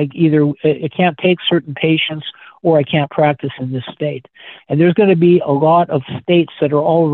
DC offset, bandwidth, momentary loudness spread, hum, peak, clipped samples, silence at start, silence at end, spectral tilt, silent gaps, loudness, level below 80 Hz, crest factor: under 0.1%; 4.2 kHz; 11 LU; none; 0 dBFS; under 0.1%; 0 s; 0 s; -10 dB/octave; none; -15 LUFS; -58 dBFS; 14 dB